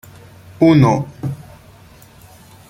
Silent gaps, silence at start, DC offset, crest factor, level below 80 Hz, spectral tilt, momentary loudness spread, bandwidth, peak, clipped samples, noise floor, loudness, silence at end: none; 0.6 s; under 0.1%; 18 dB; -48 dBFS; -8 dB/octave; 16 LU; 16 kHz; -2 dBFS; under 0.1%; -44 dBFS; -15 LUFS; 1.3 s